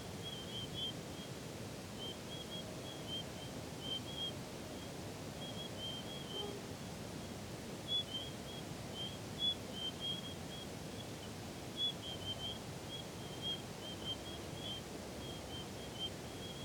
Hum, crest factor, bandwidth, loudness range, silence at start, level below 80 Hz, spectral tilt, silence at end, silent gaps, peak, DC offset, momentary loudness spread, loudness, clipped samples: none; 18 dB; over 20 kHz; 4 LU; 0 s; -64 dBFS; -3.5 dB/octave; 0 s; none; -28 dBFS; under 0.1%; 9 LU; -43 LUFS; under 0.1%